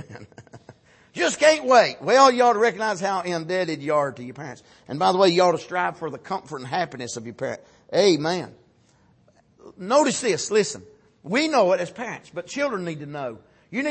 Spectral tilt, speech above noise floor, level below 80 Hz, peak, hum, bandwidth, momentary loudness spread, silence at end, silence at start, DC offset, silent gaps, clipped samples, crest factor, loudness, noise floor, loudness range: -4 dB/octave; 37 dB; -68 dBFS; -4 dBFS; none; 8.8 kHz; 17 LU; 0 s; 0 s; under 0.1%; none; under 0.1%; 20 dB; -22 LUFS; -59 dBFS; 6 LU